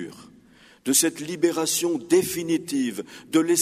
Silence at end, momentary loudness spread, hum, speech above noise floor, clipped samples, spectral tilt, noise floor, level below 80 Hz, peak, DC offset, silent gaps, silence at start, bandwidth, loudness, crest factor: 0 s; 10 LU; none; 30 dB; under 0.1%; -3 dB/octave; -53 dBFS; -66 dBFS; -6 dBFS; under 0.1%; none; 0 s; 15.5 kHz; -23 LUFS; 18 dB